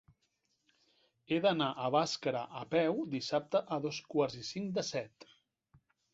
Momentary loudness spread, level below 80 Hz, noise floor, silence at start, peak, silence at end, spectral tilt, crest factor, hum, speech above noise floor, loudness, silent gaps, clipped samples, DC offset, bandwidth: 8 LU; -76 dBFS; -80 dBFS; 1.3 s; -18 dBFS; 1.05 s; -4 dB/octave; 18 dB; none; 46 dB; -34 LUFS; none; under 0.1%; under 0.1%; 8 kHz